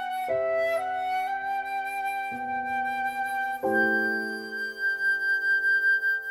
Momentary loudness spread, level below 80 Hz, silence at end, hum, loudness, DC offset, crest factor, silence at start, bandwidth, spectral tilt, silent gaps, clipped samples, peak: 9 LU; -68 dBFS; 0 s; none; -26 LUFS; under 0.1%; 14 dB; 0 s; 16.5 kHz; -3.5 dB/octave; none; under 0.1%; -12 dBFS